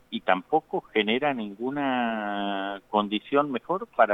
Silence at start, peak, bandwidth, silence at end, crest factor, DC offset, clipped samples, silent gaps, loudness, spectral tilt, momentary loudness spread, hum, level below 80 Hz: 0.1 s; -6 dBFS; 7.6 kHz; 0 s; 20 dB; under 0.1%; under 0.1%; none; -27 LUFS; -7 dB/octave; 6 LU; none; -70 dBFS